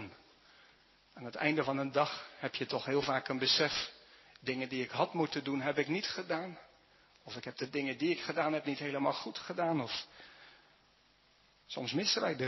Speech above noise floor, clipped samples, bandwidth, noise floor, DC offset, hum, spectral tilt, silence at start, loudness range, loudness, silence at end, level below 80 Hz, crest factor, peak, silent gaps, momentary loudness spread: 33 dB; under 0.1%; 6.2 kHz; -68 dBFS; under 0.1%; none; -4.5 dB/octave; 0 s; 4 LU; -35 LUFS; 0 s; -74 dBFS; 22 dB; -16 dBFS; none; 14 LU